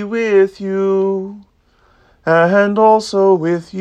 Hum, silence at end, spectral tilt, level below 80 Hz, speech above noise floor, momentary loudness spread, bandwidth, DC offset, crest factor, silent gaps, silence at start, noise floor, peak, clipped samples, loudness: none; 0 s; -6.5 dB/octave; -58 dBFS; 40 dB; 9 LU; 9.6 kHz; under 0.1%; 14 dB; none; 0 s; -54 dBFS; 0 dBFS; under 0.1%; -14 LUFS